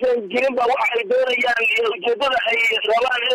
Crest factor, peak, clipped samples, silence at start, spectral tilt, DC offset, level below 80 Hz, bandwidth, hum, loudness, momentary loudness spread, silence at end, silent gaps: 10 dB; -8 dBFS; under 0.1%; 0 s; -2 dB/octave; under 0.1%; -60 dBFS; 14 kHz; none; -18 LUFS; 3 LU; 0 s; none